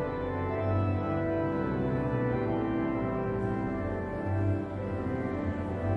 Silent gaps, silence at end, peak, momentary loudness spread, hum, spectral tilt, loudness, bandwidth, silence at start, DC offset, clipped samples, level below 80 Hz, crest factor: none; 0 s; -16 dBFS; 4 LU; none; -10 dB/octave; -31 LUFS; 5.6 kHz; 0 s; under 0.1%; under 0.1%; -48 dBFS; 14 dB